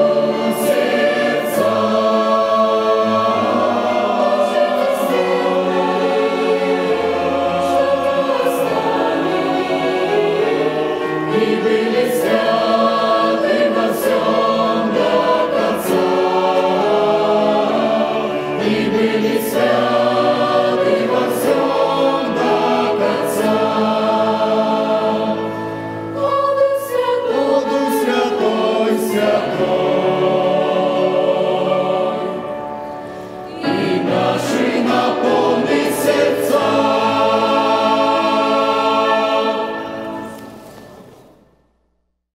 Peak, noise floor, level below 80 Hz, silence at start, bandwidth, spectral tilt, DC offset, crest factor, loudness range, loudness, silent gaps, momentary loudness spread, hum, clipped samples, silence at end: -2 dBFS; -66 dBFS; -56 dBFS; 0 s; 16 kHz; -5 dB/octave; under 0.1%; 14 dB; 3 LU; -16 LUFS; none; 4 LU; none; under 0.1%; 1.35 s